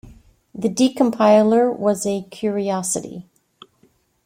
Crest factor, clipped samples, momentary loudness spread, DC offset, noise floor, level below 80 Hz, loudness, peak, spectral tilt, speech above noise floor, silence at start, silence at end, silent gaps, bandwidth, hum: 18 dB; under 0.1%; 13 LU; under 0.1%; -60 dBFS; -58 dBFS; -19 LUFS; -2 dBFS; -5 dB/octave; 42 dB; 0.05 s; 1.05 s; none; 16.5 kHz; none